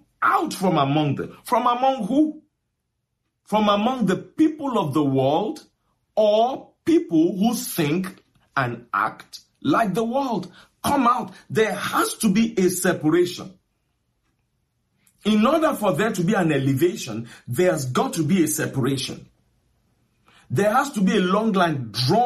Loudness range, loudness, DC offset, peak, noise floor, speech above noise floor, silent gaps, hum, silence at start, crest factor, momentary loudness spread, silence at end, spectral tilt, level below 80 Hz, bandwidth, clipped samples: 3 LU; -22 LUFS; under 0.1%; -6 dBFS; -76 dBFS; 56 dB; none; none; 0.2 s; 16 dB; 10 LU; 0 s; -5.5 dB/octave; -58 dBFS; 15 kHz; under 0.1%